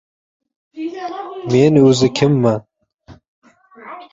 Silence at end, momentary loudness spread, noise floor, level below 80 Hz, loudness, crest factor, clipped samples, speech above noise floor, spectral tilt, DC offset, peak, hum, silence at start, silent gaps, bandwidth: 0.1 s; 18 LU; -45 dBFS; -54 dBFS; -15 LUFS; 16 dB; under 0.1%; 31 dB; -6.5 dB/octave; under 0.1%; -2 dBFS; none; 0.75 s; 2.94-2.98 s, 3.28-3.42 s; 8 kHz